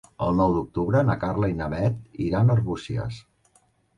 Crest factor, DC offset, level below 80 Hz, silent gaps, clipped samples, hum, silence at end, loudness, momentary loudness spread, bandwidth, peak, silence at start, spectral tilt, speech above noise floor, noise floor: 14 dB; under 0.1%; -44 dBFS; none; under 0.1%; none; 0.75 s; -24 LUFS; 10 LU; 10 kHz; -10 dBFS; 0.2 s; -9 dB/octave; 40 dB; -63 dBFS